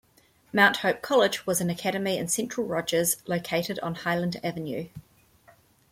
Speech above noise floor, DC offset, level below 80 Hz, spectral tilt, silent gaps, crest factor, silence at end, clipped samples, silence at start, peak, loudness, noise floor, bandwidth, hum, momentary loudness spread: 35 dB; under 0.1%; -64 dBFS; -3.5 dB/octave; none; 20 dB; 0.9 s; under 0.1%; 0.55 s; -6 dBFS; -26 LUFS; -62 dBFS; 16.5 kHz; none; 11 LU